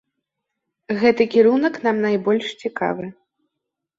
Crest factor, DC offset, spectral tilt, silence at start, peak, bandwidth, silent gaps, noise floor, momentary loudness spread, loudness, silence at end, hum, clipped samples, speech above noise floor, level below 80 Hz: 18 dB; under 0.1%; -6.5 dB/octave; 0.9 s; -4 dBFS; 7.6 kHz; none; -81 dBFS; 12 LU; -19 LUFS; 0.85 s; none; under 0.1%; 63 dB; -64 dBFS